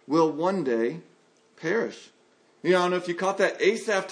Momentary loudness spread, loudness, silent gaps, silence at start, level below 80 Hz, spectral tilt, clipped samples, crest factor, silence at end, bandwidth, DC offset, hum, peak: 11 LU; -26 LUFS; none; 0.1 s; -82 dBFS; -5 dB/octave; under 0.1%; 18 dB; 0 s; 10.5 kHz; under 0.1%; none; -8 dBFS